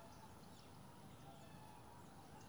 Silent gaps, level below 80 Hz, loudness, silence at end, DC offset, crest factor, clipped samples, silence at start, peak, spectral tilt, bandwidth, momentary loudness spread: none; -74 dBFS; -60 LUFS; 0 s; under 0.1%; 12 dB; under 0.1%; 0 s; -46 dBFS; -5 dB/octave; over 20 kHz; 1 LU